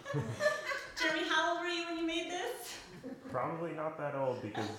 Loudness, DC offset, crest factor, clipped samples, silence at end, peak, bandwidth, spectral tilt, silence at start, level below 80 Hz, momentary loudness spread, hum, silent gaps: -36 LUFS; under 0.1%; 18 dB; under 0.1%; 0 s; -18 dBFS; 18.5 kHz; -4 dB/octave; 0 s; -70 dBFS; 12 LU; none; none